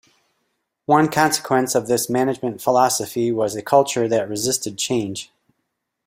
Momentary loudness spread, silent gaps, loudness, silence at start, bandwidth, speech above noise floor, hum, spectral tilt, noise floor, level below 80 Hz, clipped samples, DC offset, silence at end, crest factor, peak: 6 LU; none; -19 LUFS; 0.9 s; 16 kHz; 57 dB; none; -4 dB/octave; -76 dBFS; -60 dBFS; under 0.1%; under 0.1%; 0.8 s; 18 dB; -2 dBFS